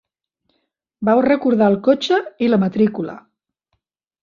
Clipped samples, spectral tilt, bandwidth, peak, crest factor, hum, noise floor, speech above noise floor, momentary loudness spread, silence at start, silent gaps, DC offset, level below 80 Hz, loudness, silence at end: under 0.1%; -7 dB/octave; 7.4 kHz; -2 dBFS; 16 dB; none; -73 dBFS; 57 dB; 7 LU; 1 s; none; under 0.1%; -60 dBFS; -17 LUFS; 1.05 s